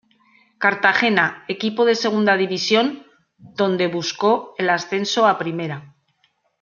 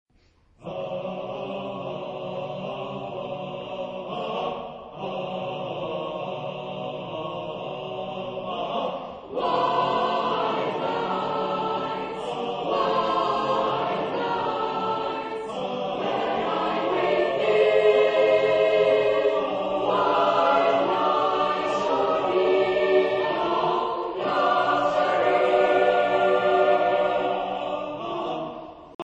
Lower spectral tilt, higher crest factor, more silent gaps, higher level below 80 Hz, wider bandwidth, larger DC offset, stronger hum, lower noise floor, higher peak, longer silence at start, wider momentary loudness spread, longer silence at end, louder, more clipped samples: second, -4 dB/octave vs -5.5 dB/octave; about the same, 20 dB vs 16 dB; second, none vs 28.95-28.99 s; second, -70 dBFS vs -60 dBFS; second, 7.4 kHz vs 8.4 kHz; neither; neither; first, -65 dBFS vs -61 dBFS; first, 0 dBFS vs -8 dBFS; about the same, 0.6 s vs 0.6 s; second, 9 LU vs 13 LU; first, 0.75 s vs 0.05 s; first, -19 LUFS vs -24 LUFS; neither